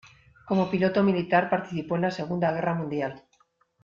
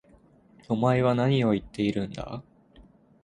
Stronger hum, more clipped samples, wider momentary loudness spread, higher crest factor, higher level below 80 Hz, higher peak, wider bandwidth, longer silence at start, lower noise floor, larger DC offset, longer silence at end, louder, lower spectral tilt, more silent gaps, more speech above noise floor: neither; neither; second, 8 LU vs 15 LU; about the same, 18 dB vs 18 dB; second, -64 dBFS vs -54 dBFS; about the same, -8 dBFS vs -8 dBFS; second, 7.2 kHz vs 9.8 kHz; second, 0.05 s vs 0.7 s; first, -67 dBFS vs -58 dBFS; neither; first, 0.65 s vs 0.4 s; about the same, -26 LUFS vs -26 LUFS; about the same, -8 dB/octave vs -8 dB/octave; neither; first, 41 dB vs 33 dB